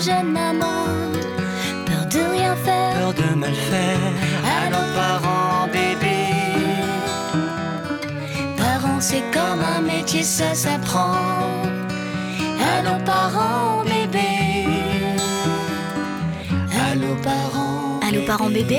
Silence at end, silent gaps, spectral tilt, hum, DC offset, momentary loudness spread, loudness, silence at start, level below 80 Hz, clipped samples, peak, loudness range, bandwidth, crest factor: 0 s; none; -4.5 dB/octave; none; under 0.1%; 5 LU; -21 LUFS; 0 s; -48 dBFS; under 0.1%; -10 dBFS; 2 LU; 19 kHz; 12 dB